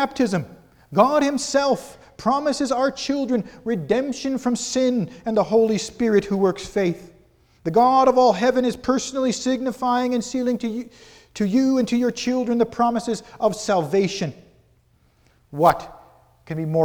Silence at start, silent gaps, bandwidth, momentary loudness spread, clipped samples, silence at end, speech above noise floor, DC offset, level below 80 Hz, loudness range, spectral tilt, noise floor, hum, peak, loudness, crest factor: 0 s; none; 20 kHz; 11 LU; under 0.1%; 0 s; 39 dB; under 0.1%; -54 dBFS; 4 LU; -5 dB/octave; -60 dBFS; none; -2 dBFS; -21 LUFS; 20 dB